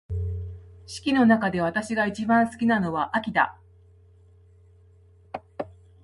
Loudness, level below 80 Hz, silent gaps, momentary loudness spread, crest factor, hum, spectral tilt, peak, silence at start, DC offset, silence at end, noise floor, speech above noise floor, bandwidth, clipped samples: -24 LUFS; -46 dBFS; none; 19 LU; 18 dB; none; -6 dB/octave; -8 dBFS; 0.1 s; under 0.1%; 0.35 s; -55 dBFS; 32 dB; 11.5 kHz; under 0.1%